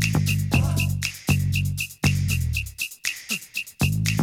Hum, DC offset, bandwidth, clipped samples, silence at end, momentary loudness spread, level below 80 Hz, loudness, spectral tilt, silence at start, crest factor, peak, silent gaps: none; under 0.1%; 18 kHz; under 0.1%; 0 s; 6 LU; -36 dBFS; -24 LUFS; -4.5 dB/octave; 0 s; 18 dB; -6 dBFS; none